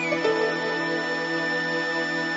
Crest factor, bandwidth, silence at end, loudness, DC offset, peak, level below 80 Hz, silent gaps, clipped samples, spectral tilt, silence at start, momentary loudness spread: 14 dB; 8 kHz; 0 s; -25 LUFS; under 0.1%; -10 dBFS; -72 dBFS; none; under 0.1%; -4 dB/octave; 0 s; 2 LU